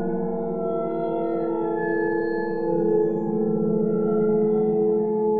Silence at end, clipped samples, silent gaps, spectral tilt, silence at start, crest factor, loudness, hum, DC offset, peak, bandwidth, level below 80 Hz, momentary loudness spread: 0 s; under 0.1%; none; -11.5 dB/octave; 0 s; 12 dB; -23 LUFS; none; 1%; -10 dBFS; 4.5 kHz; -58 dBFS; 5 LU